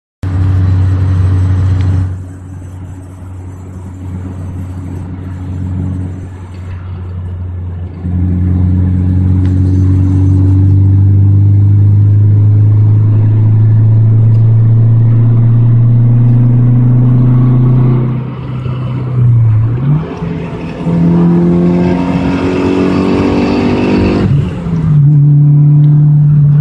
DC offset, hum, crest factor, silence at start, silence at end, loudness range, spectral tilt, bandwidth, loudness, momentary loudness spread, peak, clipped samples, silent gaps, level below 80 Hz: under 0.1%; none; 8 dB; 0.25 s; 0 s; 13 LU; -10 dB/octave; 5.6 kHz; -9 LUFS; 15 LU; 0 dBFS; under 0.1%; none; -28 dBFS